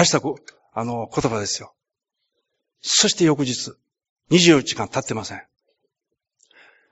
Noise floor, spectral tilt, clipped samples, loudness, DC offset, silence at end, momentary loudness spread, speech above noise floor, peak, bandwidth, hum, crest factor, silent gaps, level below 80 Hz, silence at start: -81 dBFS; -3.5 dB/octave; under 0.1%; -20 LUFS; under 0.1%; 1.5 s; 18 LU; 61 dB; 0 dBFS; 8.2 kHz; none; 22 dB; 4.09-4.16 s; -58 dBFS; 0 s